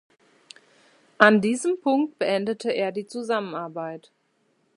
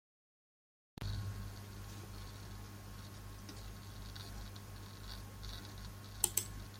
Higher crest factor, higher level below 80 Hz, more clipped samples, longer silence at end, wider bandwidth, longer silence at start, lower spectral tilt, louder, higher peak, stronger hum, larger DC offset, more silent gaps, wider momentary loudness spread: second, 26 dB vs 34 dB; second, -74 dBFS vs -54 dBFS; neither; first, 0.8 s vs 0 s; second, 11.5 kHz vs 16.5 kHz; first, 1.2 s vs 1 s; first, -5 dB/octave vs -3 dB/octave; first, -23 LUFS vs -45 LUFS; first, 0 dBFS vs -12 dBFS; second, none vs 50 Hz at -50 dBFS; neither; neither; about the same, 16 LU vs 14 LU